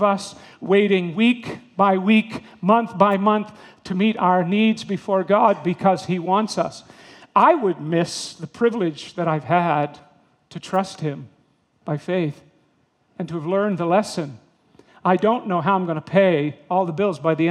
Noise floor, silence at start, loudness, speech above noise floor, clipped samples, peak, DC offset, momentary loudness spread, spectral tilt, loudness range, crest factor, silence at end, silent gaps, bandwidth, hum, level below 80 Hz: -63 dBFS; 0 s; -20 LUFS; 43 dB; under 0.1%; 0 dBFS; under 0.1%; 13 LU; -6.5 dB/octave; 6 LU; 20 dB; 0 s; none; 11.5 kHz; none; -68 dBFS